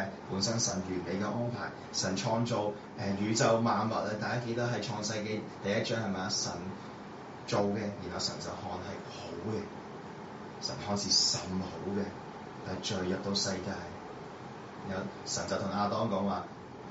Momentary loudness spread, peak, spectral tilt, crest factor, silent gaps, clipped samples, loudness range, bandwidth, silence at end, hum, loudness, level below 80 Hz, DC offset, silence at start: 16 LU; -14 dBFS; -4 dB/octave; 20 dB; none; under 0.1%; 5 LU; 8 kHz; 0 s; none; -33 LUFS; -66 dBFS; under 0.1%; 0 s